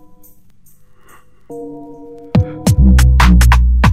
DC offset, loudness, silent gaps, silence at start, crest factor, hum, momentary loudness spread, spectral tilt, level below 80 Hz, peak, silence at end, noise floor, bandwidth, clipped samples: under 0.1%; -11 LUFS; none; 1.5 s; 12 dB; 50 Hz at -40 dBFS; 23 LU; -6 dB/octave; -14 dBFS; 0 dBFS; 0 s; -48 dBFS; 14.5 kHz; under 0.1%